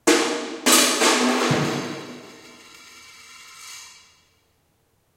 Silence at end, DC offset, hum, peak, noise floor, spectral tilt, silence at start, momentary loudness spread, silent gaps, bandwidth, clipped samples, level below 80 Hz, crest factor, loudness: 1.25 s; under 0.1%; none; -2 dBFS; -65 dBFS; -2.5 dB/octave; 0.05 s; 26 LU; none; 16 kHz; under 0.1%; -68 dBFS; 22 dB; -19 LUFS